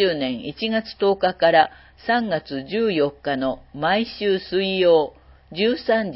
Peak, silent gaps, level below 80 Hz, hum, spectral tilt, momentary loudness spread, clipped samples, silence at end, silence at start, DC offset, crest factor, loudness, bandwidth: -2 dBFS; none; -54 dBFS; none; -9.5 dB/octave; 10 LU; under 0.1%; 0 s; 0 s; under 0.1%; 20 dB; -21 LUFS; 5.8 kHz